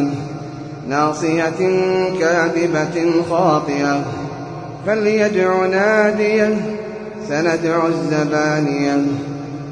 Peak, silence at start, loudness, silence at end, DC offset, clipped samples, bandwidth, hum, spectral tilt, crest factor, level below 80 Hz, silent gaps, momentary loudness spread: -2 dBFS; 0 s; -17 LUFS; 0 s; under 0.1%; under 0.1%; 10 kHz; none; -6 dB/octave; 14 dB; -54 dBFS; none; 12 LU